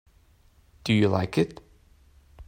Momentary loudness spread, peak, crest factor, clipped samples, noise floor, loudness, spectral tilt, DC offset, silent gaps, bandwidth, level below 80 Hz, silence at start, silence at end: 9 LU; -8 dBFS; 22 dB; under 0.1%; -59 dBFS; -25 LUFS; -7 dB/octave; under 0.1%; none; 16 kHz; -56 dBFS; 0.85 s; 0.05 s